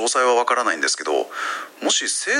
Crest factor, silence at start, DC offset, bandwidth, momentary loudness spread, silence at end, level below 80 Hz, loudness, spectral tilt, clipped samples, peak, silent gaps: 16 dB; 0 s; under 0.1%; 16 kHz; 9 LU; 0 s; -82 dBFS; -20 LUFS; 1 dB/octave; under 0.1%; -6 dBFS; none